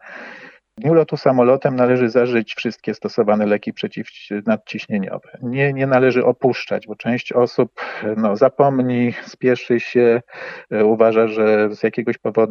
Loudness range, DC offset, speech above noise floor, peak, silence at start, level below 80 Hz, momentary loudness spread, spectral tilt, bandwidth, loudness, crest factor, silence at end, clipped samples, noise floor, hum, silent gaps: 3 LU; under 0.1%; 23 dB; 0 dBFS; 0.05 s; -68 dBFS; 11 LU; -8 dB/octave; 6.8 kHz; -18 LUFS; 18 dB; 0 s; under 0.1%; -41 dBFS; none; none